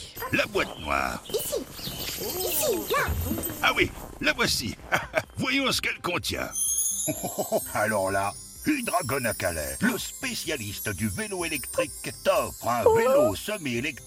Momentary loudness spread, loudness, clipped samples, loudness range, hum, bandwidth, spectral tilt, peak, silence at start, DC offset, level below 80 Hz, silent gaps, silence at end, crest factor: 7 LU; -26 LUFS; under 0.1%; 3 LU; none; 16.5 kHz; -3 dB/octave; -6 dBFS; 0 s; under 0.1%; -46 dBFS; none; 0 s; 20 dB